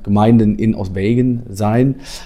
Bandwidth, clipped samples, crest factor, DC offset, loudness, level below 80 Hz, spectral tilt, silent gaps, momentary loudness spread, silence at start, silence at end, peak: 13.5 kHz; under 0.1%; 14 dB; under 0.1%; -15 LUFS; -34 dBFS; -8 dB/octave; none; 7 LU; 0 s; 0 s; 0 dBFS